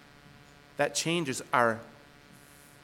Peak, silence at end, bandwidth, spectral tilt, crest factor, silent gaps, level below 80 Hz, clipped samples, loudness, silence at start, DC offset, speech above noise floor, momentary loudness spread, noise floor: -8 dBFS; 0.9 s; 19 kHz; -3.5 dB/octave; 24 dB; none; -68 dBFS; under 0.1%; -29 LUFS; 0.8 s; under 0.1%; 26 dB; 17 LU; -55 dBFS